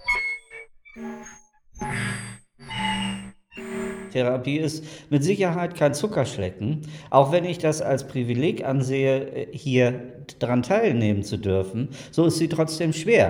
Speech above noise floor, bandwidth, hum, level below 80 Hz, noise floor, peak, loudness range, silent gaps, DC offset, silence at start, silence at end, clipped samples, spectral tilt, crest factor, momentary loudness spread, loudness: 26 dB; 17.5 kHz; none; -54 dBFS; -49 dBFS; -4 dBFS; 7 LU; none; under 0.1%; 0 s; 0 s; under 0.1%; -6 dB/octave; 20 dB; 15 LU; -24 LUFS